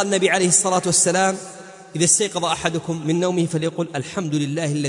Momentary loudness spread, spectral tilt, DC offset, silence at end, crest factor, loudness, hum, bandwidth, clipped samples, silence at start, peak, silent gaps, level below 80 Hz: 11 LU; -3.5 dB/octave; under 0.1%; 0 s; 18 dB; -19 LUFS; none; 11 kHz; under 0.1%; 0 s; -4 dBFS; none; -58 dBFS